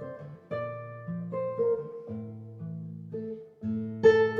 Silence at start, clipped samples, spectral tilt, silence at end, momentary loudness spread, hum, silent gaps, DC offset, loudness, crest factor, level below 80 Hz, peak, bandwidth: 0 s; under 0.1%; -7.5 dB/octave; 0 s; 17 LU; none; none; under 0.1%; -31 LUFS; 22 dB; -76 dBFS; -8 dBFS; 7 kHz